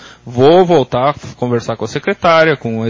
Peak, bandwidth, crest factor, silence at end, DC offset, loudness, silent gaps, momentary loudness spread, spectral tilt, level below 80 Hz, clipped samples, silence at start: 0 dBFS; 7.6 kHz; 12 dB; 0 s; under 0.1%; -12 LUFS; none; 11 LU; -6.5 dB/octave; -46 dBFS; under 0.1%; 0.05 s